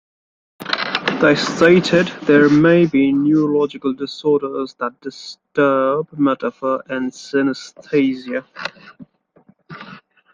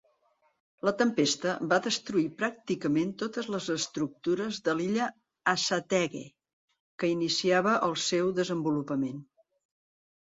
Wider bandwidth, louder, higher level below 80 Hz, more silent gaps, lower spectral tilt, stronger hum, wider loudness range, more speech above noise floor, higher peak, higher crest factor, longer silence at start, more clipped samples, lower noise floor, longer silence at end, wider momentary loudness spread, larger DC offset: about the same, 7.6 kHz vs 7.8 kHz; first, -17 LUFS vs -29 LUFS; first, -58 dBFS vs -72 dBFS; second, none vs 6.53-6.68 s, 6.80-6.98 s; first, -6 dB/octave vs -4 dB/octave; neither; first, 8 LU vs 2 LU; second, 37 dB vs 42 dB; first, 0 dBFS vs -10 dBFS; about the same, 18 dB vs 20 dB; second, 0.6 s vs 0.85 s; neither; second, -54 dBFS vs -71 dBFS; second, 0.35 s vs 1.1 s; first, 18 LU vs 7 LU; neither